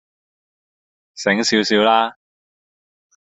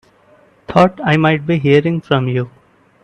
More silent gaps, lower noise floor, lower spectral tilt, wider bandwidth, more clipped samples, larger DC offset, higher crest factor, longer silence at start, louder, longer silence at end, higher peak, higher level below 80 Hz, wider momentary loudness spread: neither; first, under -90 dBFS vs -50 dBFS; second, -3.5 dB/octave vs -8 dB/octave; about the same, 8.2 kHz vs 8.8 kHz; neither; neither; about the same, 20 dB vs 16 dB; first, 1.15 s vs 0.7 s; second, -17 LUFS vs -14 LUFS; first, 1.15 s vs 0.55 s; about the same, -2 dBFS vs 0 dBFS; second, -64 dBFS vs -50 dBFS; about the same, 9 LU vs 7 LU